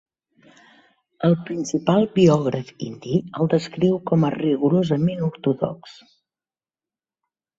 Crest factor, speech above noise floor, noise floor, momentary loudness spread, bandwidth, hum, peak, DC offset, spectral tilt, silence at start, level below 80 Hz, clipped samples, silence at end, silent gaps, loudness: 18 dB; over 70 dB; under -90 dBFS; 10 LU; 7.8 kHz; none; -4 dBFS; under 0.1%; -7.5 dB/octave; 1.2 s; -60 dBFS; under 0.1%; 1.7 s; none; -21 LUFS